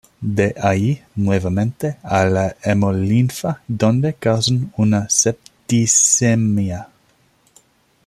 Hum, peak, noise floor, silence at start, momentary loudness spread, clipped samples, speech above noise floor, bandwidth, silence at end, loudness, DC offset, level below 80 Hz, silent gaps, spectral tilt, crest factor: none; -2 dBFS; -58 dBFS; 0.2 s; 9 LU; under 0.1%; 41 dB; 14.5 kHz; 1.2 s; -17 LUFS; under 0.1%; -52 dBFS; none; -4.5 dB/octave; 16 dB